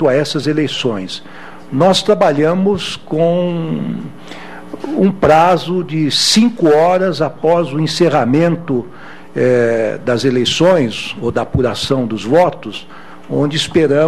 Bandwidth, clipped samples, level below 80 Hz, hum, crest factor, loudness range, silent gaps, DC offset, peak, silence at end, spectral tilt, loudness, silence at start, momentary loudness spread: 13.5 kHz; under 0.1%; -44 dBFS; none; 14 dB; 3 LU; none; 2%; 0 dBFS; 0 s; -5 dB/octave; -14 LUFS; 0 s; 16 LU